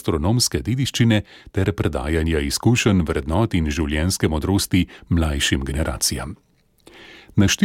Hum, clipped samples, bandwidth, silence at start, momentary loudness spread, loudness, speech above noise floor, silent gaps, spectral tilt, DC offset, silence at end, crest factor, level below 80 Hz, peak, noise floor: none; under 0.1%; 17 kHz; 0.05 s; 6 LU; -20 LUFS; 32 dB; none; -4.5 dB/octave; under 0.1%; 0 s; 16 dB; -32 dBFS; -4 dBFS; -52 dBFS